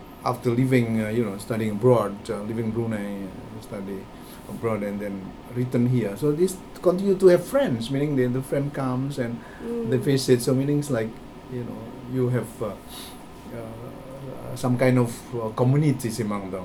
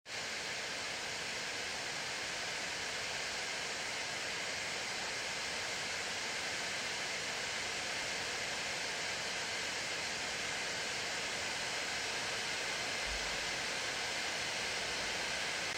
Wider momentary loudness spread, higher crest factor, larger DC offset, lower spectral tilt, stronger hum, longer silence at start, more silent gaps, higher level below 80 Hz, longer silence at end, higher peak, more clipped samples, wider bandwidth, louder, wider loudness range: first, 17 LU vs 2 LU; first, 20 dB vs 14 dB; neither; first, -7 dB/octave vs -0.5 dB/octave; neither; about the same, 0 s vs 0.05 s; neither; first, -50 dBFS vs -64 dBFS; about the same, 0 s vs 0 s; first, -4 dBFS vs -24 dBFS; neither; about the same, 17.5 kHz vs 16 kHz; first, -24 LUFS vs -37 LUFS; first, 8 LU vs 2 LU